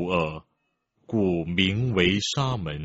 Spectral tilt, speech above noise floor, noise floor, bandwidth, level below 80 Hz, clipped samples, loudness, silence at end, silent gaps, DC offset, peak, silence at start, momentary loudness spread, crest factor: -4.5 dB/octave; 50 dB; -75 dBFS; 8 kHz; -48 dBFS; under 0.1%; -25 LUFS; 0 s; none; under 0.1%; -4 dBFS; 0 s; 8 LU; 20 dB